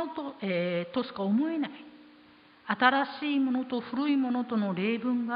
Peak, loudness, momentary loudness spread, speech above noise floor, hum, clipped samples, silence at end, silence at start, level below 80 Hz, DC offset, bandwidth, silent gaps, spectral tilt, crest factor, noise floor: -8 dBFS; -29 LUFS; 11 LU; 28 dB; none; under 0.1%; 0 s; 0 s; -76 dBFS; under 0.1%; 5.2 kHz; none; -9.5 dB/octave; 20 dB; -57 dBFS